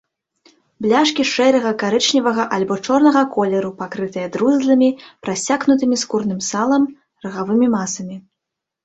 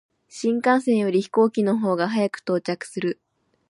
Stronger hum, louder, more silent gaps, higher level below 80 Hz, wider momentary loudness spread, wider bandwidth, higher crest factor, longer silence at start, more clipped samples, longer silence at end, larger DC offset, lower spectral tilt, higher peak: neither; first, -17 LUFS vs -22 LUFS; neither; first, -60 dBFS vs -74 dBFS; about the same, 11 LU vs 9 LU; second, 8.2 kHz vs 11.5 kHz; about the same, 16 dB vs 16 dB; first, 0.8 s vs 0.35 s; neither; about the same, 0.65 s vs 0.55 s; neither; second, -4 dB/octave vs -6 dB/octave; first, -2 dBFS vs -6 dBFS